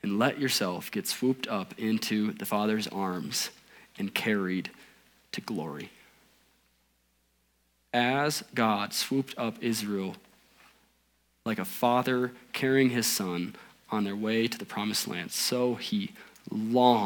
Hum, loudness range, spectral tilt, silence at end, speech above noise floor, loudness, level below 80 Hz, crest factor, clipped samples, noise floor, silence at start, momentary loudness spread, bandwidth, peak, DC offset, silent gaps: none; 6 LU; -4 dB/octave; 0 s; 42 dB; -29 LUFS; -76 dBFS; 22 dB; under 0.1%; -71 dBFS; 0.05 s; 11 LU; 19.5 kHz; -8 dBFS; under 0.1%; none